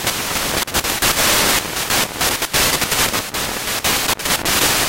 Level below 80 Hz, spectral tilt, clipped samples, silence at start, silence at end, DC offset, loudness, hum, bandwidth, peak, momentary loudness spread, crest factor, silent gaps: -36 dBFS; -1 dB/octave; under 0.1%; 0 s; 0 s; under 0.1%; -16 LUFS; none; 17 kHz; -2 dBFS; 6 LU; 16 dB; none